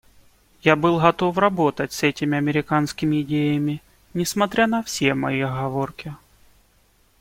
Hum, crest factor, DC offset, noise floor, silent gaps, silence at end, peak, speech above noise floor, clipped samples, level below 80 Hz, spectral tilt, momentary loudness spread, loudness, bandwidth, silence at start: none; 20 dB; under 0.1%; -59 dBFS; none; 1.05 s; -2 dBFS; 39 dB; under 0.1%; -54 dBFS; -5.5 dB/octave; 9 LU; -21 LUFS; 16.5 kHz; 0.65 s